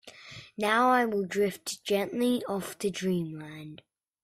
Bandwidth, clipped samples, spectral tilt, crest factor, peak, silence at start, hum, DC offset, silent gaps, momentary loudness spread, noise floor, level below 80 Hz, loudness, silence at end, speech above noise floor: 16 kHz; under 0.1%; -4.5 dB/octave; 18 dB; -10 dBFS; 0.05 s; none; under 0.1%; none; 20 LU; -48 dBFS; -70 dBFS; -29 LUFS; 0.45 s; 19 dB